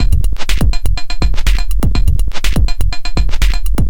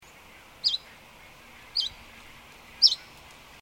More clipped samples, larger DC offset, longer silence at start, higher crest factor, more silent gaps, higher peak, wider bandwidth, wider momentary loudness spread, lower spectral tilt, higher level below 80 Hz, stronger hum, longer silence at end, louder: neither; first, 30% vs under 0.1%; second, 0 s vs 0.65 s; second, 8 dB vs 28 dB; neither; first, 0 dBFS vs -4 dBFS; about the same, 17.5 kHz vs 18.5 kHz; second, 3 LU vs 27 LU; first, -5 dB/octave vs 0 dB/octave; first, -14 dBFS vs -60 dBFS; neither; second, 0 s vs 0.65 s; first, -18 LUFS vs -25 LUFS